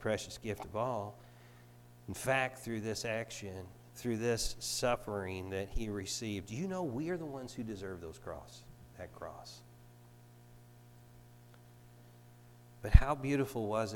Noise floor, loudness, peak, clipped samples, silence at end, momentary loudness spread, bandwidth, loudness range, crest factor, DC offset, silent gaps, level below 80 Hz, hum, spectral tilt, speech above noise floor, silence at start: -58 dBFS; -37 LUFS; -6 dBFS; under 0.1%; 0 s; 19 LU; 18 kHz; 17 LU; 32 dB; under 0.1%; none; -40 dBFS; 60 Hz at -60 dBFS; -5 dB/octave; 23 dB; 0 s